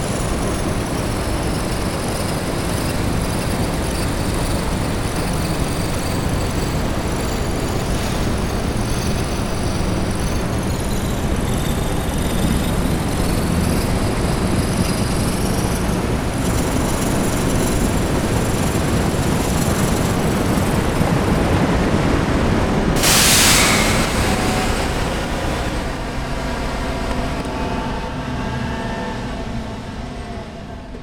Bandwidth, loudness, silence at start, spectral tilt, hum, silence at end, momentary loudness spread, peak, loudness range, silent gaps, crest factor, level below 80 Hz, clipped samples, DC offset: 18 kHz; -19 LUFS; 0 s; -4.5 dB/octave; none; 0 s; 7 LU; -2 dBFS; 9 LU; none; 18 dB; -26 dBFS; under 0.1%; under 0.1%